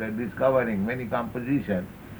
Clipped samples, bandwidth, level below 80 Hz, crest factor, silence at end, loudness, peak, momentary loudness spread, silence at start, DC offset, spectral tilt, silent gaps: under 0.1%; over 20 kHz; -52 dBFS; 18 dB; 0 s; -27 LUFS; -10 dBFS; 7 LU; 0 s; under 0.1%; -8.5 dB/octave; none